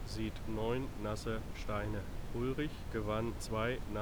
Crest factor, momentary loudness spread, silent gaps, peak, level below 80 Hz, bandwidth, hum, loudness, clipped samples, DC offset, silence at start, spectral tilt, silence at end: 16 dB; 4 LU; none; -22 dBFS; -46 dBFS; over 20 kHz; none; -39 LUFS; under 0.1%; under 0.1%; 0 s; -6 dB/octave; 0 s